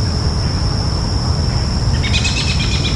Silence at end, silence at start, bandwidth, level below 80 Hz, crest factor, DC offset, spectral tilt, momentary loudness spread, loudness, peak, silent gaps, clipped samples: 0 s; 0 s; 11.5 kHz; -22 dBFS; 14 dB; under 0.1%; -4.5 dB/octave; 3 LU; -17 LUFS; -2 dBFS; none; under 0.1%